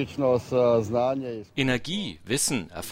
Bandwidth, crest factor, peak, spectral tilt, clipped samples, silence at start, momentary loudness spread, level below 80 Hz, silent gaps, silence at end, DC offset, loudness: 16 kHz; 18 dB; -8 dBFS; -4 dB/octave; under 0.1%; 0 s; 9 LU; -56 dBFS; none; 0 s; under 0.1%; -26 LUFS